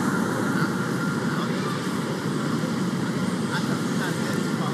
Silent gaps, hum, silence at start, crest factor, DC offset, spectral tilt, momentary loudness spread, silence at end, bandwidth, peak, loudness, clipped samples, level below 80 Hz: none; none; 0 s; 14 dB; under 0.1%; -5.5 dB/octave; 2 LU; 0 s; 15 kHz; -12 dBFS; -26 LUFS; under 0.1%; -62 dBFS